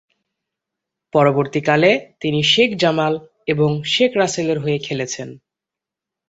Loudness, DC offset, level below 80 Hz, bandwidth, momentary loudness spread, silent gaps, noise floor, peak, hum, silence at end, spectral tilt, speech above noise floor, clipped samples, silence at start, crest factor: -17 LUFS; under 0.1%; -58 dBFS; 8.2 kHz; 10 LU; none; -86 dBFS; -2 dBFS; none; 0.9 s; -4.5 dB/octave; 69 dB; under 0.1%; 1.15 s; 18 dB